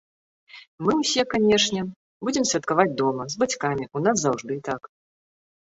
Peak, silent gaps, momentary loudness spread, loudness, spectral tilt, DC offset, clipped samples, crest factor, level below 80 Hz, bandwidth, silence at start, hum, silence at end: -4 dBFS; 0.67-0.78 s, 1.96-2.20 s; 10 LU; -23 LUFS; -3.5 dB/octave; under 0.1%; under 0.1%; 20 dB; -60 dBFS; 8.2 kHz; 0.55 s; none; 0.9 s